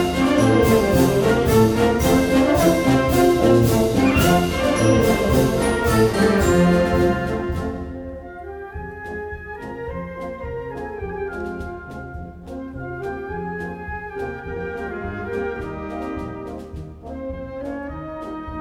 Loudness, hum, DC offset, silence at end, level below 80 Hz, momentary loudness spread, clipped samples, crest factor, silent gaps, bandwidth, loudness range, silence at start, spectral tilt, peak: -19 LUFS; none; under 0.1%; 0 s; -34 dBFS; 17 LU; under 0.1%; 16 dB; none; over 20 kHz; 14 LU; 0 s; -6 dB/octave; -4 dBFS